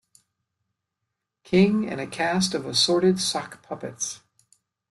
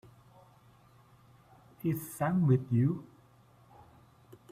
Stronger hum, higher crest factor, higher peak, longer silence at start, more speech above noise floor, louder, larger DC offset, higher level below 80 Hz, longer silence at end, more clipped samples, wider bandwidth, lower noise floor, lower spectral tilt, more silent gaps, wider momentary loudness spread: neither; about the same, 18 dB vs 20 dB; first, -8 dBFS vs -14 dBFS; second, 1.5 s vs 1.85 s; first, 59 dB vs 32 dB; first, -23 LUFS vs -31 LUFS; neither; about the same, -62 dBFS vs -66 dBFS; second, 0.75 s vs 1.5 s; neither; second, 12.5 kHz vs 15.5 kHz; first, -83 dBFS vs -61 dBFS; second, -4 dB/octave vs -8.5 dB/octave; neither; first, 16 LU vs 9 LU